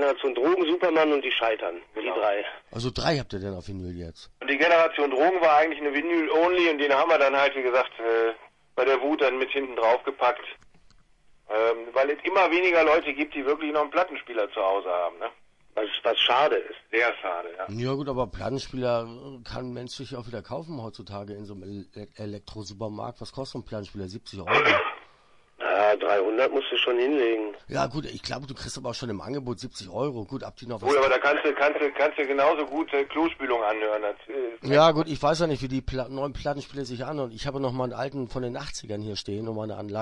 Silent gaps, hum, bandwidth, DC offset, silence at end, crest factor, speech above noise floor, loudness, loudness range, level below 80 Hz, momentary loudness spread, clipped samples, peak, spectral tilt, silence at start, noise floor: none; none; 11 kHz; under 0.1%; 0 s; 20 dB; 32 dB; -25 LUFS; 10 LU; -52 dBFS; 16 LU; under 0.1%; -6 dBFS; -5 dB/octave; 0 s; -58 dBFS